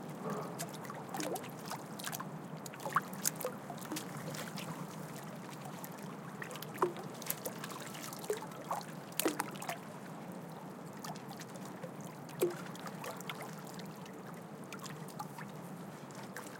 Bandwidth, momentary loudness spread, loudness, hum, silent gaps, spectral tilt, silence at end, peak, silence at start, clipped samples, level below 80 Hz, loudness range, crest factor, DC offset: 17 kHz; 10 LU; -42 LUFS; none; none; -4 dB/octave; 0 s; -12 dBFS; 0 s; under 0.1%; -86 dBFS; 4 LU; 30 dB; under 0.1%